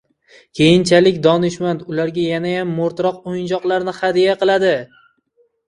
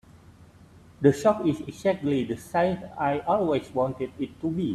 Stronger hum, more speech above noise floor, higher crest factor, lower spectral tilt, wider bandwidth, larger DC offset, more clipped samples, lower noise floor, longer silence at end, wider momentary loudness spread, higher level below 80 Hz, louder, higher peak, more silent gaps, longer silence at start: neither; first, 45 dB vs 26 dB; second, 16 dB vs 22 dB; second, -5.5 dB/octave vs -7 dB/octave; second, 11 kHz vs 13.5 kHz; neither; neither; first, -61 dBFS vs -52 dBFS; first, 0.8 s vs 0 s; about the same, 9 LU vs 7 LU; about the same, -54 dBFS vs -58 dBFS; first, -16 LUFS vs -26 LUFS; first, 0 dBFS vs -6 dBFS; neither; first, 0.55 s vs 0.15 s